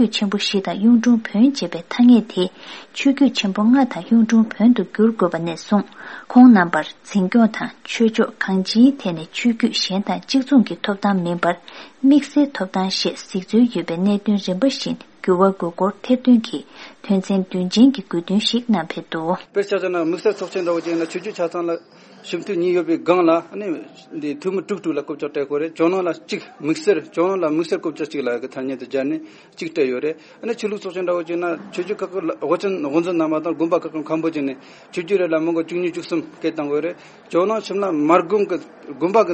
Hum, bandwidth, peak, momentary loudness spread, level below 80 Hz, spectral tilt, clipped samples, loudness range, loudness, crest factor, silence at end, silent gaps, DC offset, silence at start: none; 8.6 kHz; 0 dBFS; 12 LU; -68 dBFS; -6 dB/octave; under 0.1%; 7 LU; -19 LUFS; 18 dB; 0 s; none; under 0.1%; 0 s